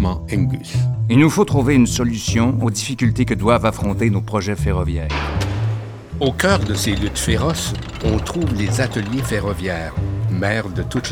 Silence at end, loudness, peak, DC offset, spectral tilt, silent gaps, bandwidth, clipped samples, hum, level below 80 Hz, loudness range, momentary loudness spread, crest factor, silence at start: 0 s; -19 LUFS; -2 dBFS; under 0.1%; -5.5 dB/octave; none; 16.5 kHz; under 0.1%; none; -32 dBFS; 4 LU; 8 LU; 16 dB; 0 s